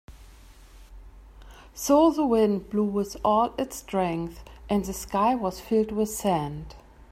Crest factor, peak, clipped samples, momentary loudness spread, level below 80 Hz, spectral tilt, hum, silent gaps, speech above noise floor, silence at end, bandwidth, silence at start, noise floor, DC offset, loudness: 18 dB; -8 dBFS; under 0.1%; 14 LU; -48 dBFS; -5.5 dB/octave; none; none; 25 dB; 0.3 s; 16 kHz; 0.1 s; -49 dBFS; under 0.1%; -25 LUFS